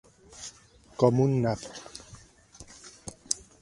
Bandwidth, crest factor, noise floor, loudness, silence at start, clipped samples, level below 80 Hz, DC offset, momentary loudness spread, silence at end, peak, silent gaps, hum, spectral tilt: 11.5 kHz; 28 dB; -56 dBFS; -27 LUFS; 0.4 s; under 0.1%; -58 dBFS; under 0.1%; 23 LU; 0.25 s; -2 dBFS; none; none; -6 dB/octave